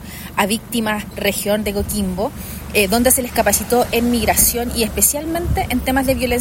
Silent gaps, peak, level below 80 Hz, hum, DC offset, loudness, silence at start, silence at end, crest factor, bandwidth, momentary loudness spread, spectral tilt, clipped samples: none; 0 dBFS; -32 dBFS; none; under 0.1%; -17 LUFS; 0 s; 0 s; 18 dB; 16.5 kHz; 8 LU; -3.5 dB/octave; under 0.1%